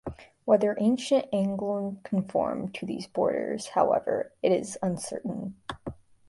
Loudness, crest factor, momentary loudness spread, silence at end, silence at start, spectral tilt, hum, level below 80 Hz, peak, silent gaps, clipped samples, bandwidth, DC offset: -28 LUFS; 20 dB; 14 LU; 0.35 s; 0.05 s; -6 dB/octave; none; -58 dBFS; -8 dBFS; none; under 0.1%; 11.5 kHz; under 0.1%